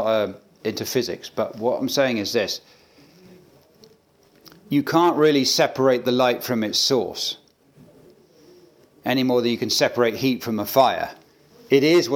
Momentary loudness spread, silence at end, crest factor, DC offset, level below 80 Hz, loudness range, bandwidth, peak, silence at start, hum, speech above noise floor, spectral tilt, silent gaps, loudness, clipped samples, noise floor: 11 LU; 0 s; 20 dB; under 0.1%; -70 dBFS; 6 LU; 19 kHz; -4 dBFS; 0 s; none; 37 dB; -4 dB/octave; none; -21 LUFS; under 0.1%; -57 dBFS